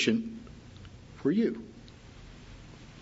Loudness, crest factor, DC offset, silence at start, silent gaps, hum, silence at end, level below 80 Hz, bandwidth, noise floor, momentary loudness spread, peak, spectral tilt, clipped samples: -31 LUFS; 20 dB; under 0.1%; 0 s; none; none; 0 s; -56 dBFS; 8 kHz; -50 dBFS; 23 LU; -14 dBFS; -5 dB/octave; under 0.1%